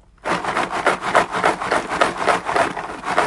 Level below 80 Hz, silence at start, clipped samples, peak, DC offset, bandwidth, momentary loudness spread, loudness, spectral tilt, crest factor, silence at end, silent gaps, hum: -50 dBFS; 0.25 s; under 0.1%; 0 dBFS; under 0.1%; 11.5 kHz; 5 LU; -20 LUFS; -3.5 dB/octave; 20 dB; 0 s; none; none